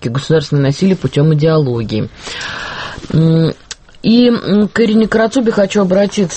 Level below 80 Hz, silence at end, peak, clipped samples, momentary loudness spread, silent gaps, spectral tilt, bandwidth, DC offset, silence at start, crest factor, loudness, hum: -42 dBFS; 0 s; 0 dBFS; under 0.1%; 12 LU; none; -6.5 dB/octave; 8.6 kHz; under 0.1%; 0 s; 12 dB; -13 LUFS; none